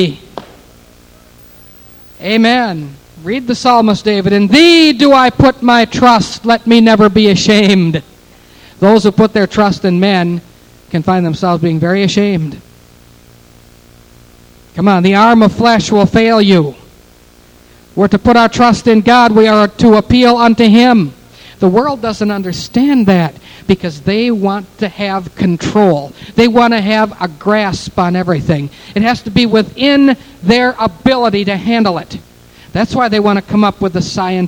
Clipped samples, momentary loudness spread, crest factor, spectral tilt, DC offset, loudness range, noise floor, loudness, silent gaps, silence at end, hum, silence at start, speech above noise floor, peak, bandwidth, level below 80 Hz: 0.7%; 11 LU; 10 dB; -6 dB/octave; under 0.1%; 7 LU; -42 dBFS; -10 LUFS; none; 0 s; none; 0 s; 33 dB; 0 dBFS; 18.5 kHz; -38 dBFS